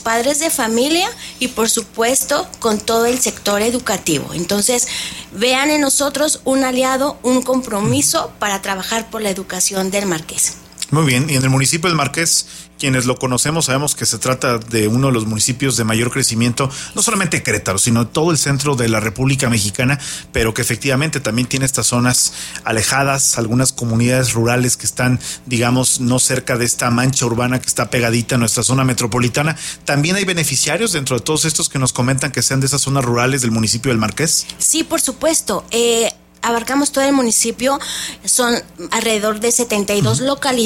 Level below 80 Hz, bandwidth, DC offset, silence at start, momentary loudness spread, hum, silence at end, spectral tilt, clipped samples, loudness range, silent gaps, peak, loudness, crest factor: -44 dBFS; 16.5 kHz; under 0.1%; 0 s; 5 LU; none; 0 s; -3.5 dB/octave; under 0.1%; 1 LU; none; -2 dBFS; -16 LUFS; 16 dB